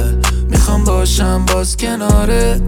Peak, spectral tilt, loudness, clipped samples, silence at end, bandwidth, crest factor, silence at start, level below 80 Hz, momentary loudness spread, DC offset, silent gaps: -2 dBFS; -5 dB/octave; -14 LUFS; under 0.1%; 0 s; 17 kHz; 10 dB; 0 s; -14 dBFS; 3 LU; under 0.1%; none